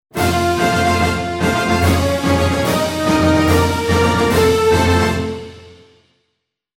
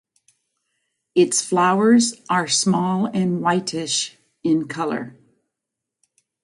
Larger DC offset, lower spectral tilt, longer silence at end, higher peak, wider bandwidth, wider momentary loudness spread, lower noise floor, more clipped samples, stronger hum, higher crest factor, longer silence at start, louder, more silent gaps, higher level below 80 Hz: neither; first, -5.5 dB/octave vs -4 dB/octave; second, 1.05 s vs 1.35 s; about the same, -2 dBFS vs -4 dBFS; first, 16.5 kHz vs 11.5 kHz; second, 5 LU vs 10 LU; second, -73 dBFS vs -84 dBFS; neither; neither; about the same, 14 dB vs 16 dB; second, 0.15 s vs 1.15 s; first, -15 LUFS vs -20 LUFS; neither; first, -32 dBFS vs -68 dBFS